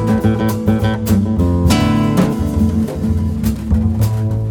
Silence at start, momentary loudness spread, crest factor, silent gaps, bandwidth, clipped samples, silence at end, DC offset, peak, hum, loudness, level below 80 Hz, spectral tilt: 0 s; 5 LU; 14 dB; none; 20 kHz; under 0.1%; 0 s; under 0.1%; 0 dBFS; none; -15 LUFS; -24 dBFS; -7 dB/octave